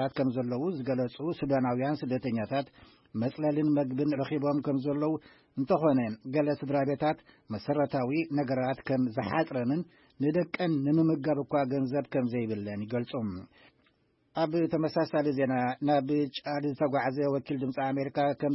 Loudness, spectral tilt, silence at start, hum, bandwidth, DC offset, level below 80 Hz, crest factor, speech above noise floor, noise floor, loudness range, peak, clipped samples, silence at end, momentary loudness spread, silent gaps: -30 LUFS; -11 dB/octave; 0 s; none; 5.8 kHz; under 0.1%; -68 dBFS; 16 dB; 40 dB; -70 dBFS; 3 LU; -12 dBFS; under 0.1%; 0 s; 7 LU; none